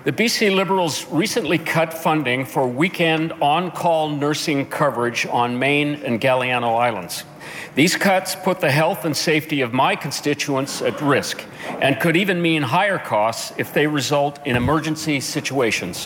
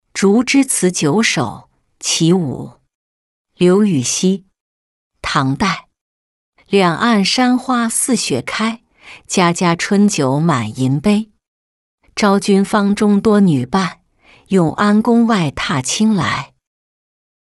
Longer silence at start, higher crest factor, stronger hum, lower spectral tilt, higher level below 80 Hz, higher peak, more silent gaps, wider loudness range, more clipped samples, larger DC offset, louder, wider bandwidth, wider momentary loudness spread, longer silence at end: second, 0 s vs 0.15 s; about the same, 16 dB vs 14 dB; neither; about the same, -4.5 dB/octave vs -4.5 dB/octave; second, -54 dBFS vs -48 dBFS; about the same, -4 dBFS vs -2 dBFS; second, none vs 2.95-3.45 s, 4.60-5.10 s, 6.01-6.53 s, 11.48-11.98 s; about the same, 1 LU vs 3 LU; neither; neither; second, -19 LUFS vs -15 LUFS; first, 19 kHz vs 12 kHz; second, 5 LU vs 10 LU; second, 0 s vs 1.1 s